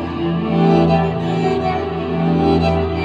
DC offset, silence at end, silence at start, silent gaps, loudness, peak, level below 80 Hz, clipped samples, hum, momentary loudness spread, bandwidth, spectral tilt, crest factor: under 0.1%; 0 s; 0 s; none; -17 LUFS; -4 dBFS; -34 dBFS; under 0.1%; none; 7 LU; 7.6 kHz; -8.5 dB/octave; 14 dB